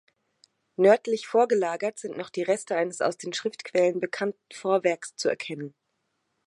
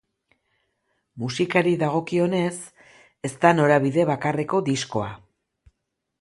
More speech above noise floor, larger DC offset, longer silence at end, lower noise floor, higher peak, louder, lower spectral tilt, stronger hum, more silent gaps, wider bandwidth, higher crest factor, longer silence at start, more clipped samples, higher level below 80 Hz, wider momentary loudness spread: second, 51 dB vs 57 dB; neither; second, 0.8 s vs 1.05 s; about the same, -77 dBFS vs -79 dBFS; second, -8 dBFS vs -2 dBFS; second, -26 LUFS vs -22 LUFS; second, -4 dB/octave vs -6 dB/octave; neither; neither; about the same, 11.5 kHz vs 11.5 kHz; about the same, 20 dB vs 22 dB; second, 0.8 s vs 1.15 s; neither; second, -82 dBFS vs -62 dBFS; second, 12 LU vs 15 LU